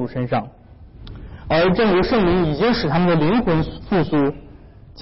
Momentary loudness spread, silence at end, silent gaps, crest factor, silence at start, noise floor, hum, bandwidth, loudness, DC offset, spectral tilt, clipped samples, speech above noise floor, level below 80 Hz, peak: 21 LU; 0 s; none; 10 dB; 0 s; -42 dBFS; none; 5.8 kHz; -18 LUFS; 1%; -10.5 dB/octave; under 0.1%; 25 dB; -36 dBFS; -10 dBFS